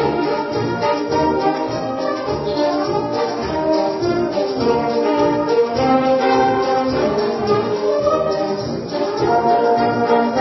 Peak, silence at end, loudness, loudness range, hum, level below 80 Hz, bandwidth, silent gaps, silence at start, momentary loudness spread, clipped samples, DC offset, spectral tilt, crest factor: -2 dBFS; 0 s; -18 LUFS; 3 LU; none; -44 dBFS; 6 kHz; none; 0 s; 6 LU; under 0.1%; under 0.1%; -6.5 dB/octave; 14 dB